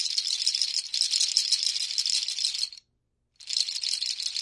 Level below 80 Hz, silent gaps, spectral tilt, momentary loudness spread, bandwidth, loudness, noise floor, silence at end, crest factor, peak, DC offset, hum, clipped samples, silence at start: -78 dBFS; none; 6 dB/octave; 5 LU; 11.5 kHz; -25 LUFS; -75 dBFS; 0 s; 24 dB; -4 dBFS; under 0.1%; none; under 0.1%; 0 s